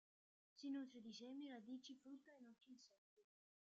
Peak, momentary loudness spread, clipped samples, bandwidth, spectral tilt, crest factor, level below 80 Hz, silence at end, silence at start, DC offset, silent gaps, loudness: -42 dBFS; 15 LU; under 0.1%; 7.6 kHz; -3 dB/octave; 16 dB; under -90 dBFS; 0.45 s; 0.55 s; under 0.1%; 2.98-3.17 s; -56 LUFS